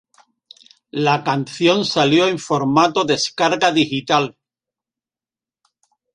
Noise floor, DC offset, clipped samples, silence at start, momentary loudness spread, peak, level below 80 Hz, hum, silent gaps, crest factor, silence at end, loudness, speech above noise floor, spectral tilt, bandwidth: under -90 dBFS; under 0.1%; under 0.1%; 0.95 s; 5 LU; -2 dBFS; -62 dBFS; none; none; 18 dB; 1.85 s; -17 LUFS; over 73 dB; -4.5 dB/octave; 11 kHz